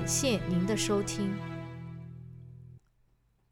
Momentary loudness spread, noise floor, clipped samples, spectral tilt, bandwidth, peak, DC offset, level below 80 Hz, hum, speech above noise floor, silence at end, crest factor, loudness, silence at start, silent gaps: 21 LU; -69 dBFS; under 0.1%; -4.5 dB/octave; 17 kHz; -14 dBFS; under 0.1%; -54 dBFS; none; 40 dB; 0.75 s; 20 dB; -31 LUFS; 0 s; none